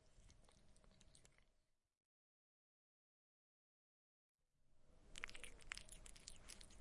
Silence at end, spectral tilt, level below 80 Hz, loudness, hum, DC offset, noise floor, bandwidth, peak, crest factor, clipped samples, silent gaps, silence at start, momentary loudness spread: 0 s; -1 dB/octave; -70 dBFS; -57 LUFS; none; under 0.1%; -83 dBFS; 11.5 kHz; -28 dBFS; 34 dB; under 0.1%; 1.97-4.35 s; 0 s; 6 LU